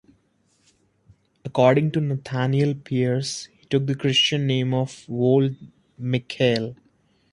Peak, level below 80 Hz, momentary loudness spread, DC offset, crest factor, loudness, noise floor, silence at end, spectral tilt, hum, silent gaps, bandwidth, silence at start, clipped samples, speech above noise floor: -4 dBFS; -62 dBFS; 11 LU; under 0.1%; 20 dB; -22 LUFS; -65 dBFS; 0.6 s; -6 dB/octave; none; none; 11 kHz; 1.45 s; under 0.1%; 43 dB